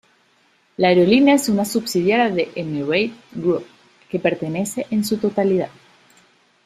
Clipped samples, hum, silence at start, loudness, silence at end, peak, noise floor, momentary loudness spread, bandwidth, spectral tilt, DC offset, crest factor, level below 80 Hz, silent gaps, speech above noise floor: under 0.1%; none; 0.8 s; -19 LUFS; 1 s; -2 dBFS; -59 dBFS; 11 LU; 15.5 kHz; -5 dB/octave; under 0.1%; 18 dB; -60 dBFS; none; 41 dB